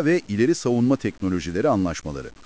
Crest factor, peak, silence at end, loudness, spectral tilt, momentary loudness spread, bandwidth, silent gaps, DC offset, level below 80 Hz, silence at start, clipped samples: 16 dB; -6 dBFS; 0.15 s; -22 LUFS; -6.5 dB/octave; 6 LU; 8 kHz; none; 0.4%; -44 dBFS; 0 s; under 0.1%